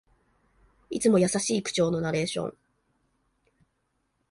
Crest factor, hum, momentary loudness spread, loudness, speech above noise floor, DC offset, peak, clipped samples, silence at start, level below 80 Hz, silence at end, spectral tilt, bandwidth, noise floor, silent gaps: 18 dB; none; 12 LU; -26 LUFS; 50 dB; under 0.1%; -12 dBFS; under 0.1%; 0.9 s; -62 dBFS; 1.8 s; -4.5 dB/octave; 11.5 kHz; -75 dBFS; none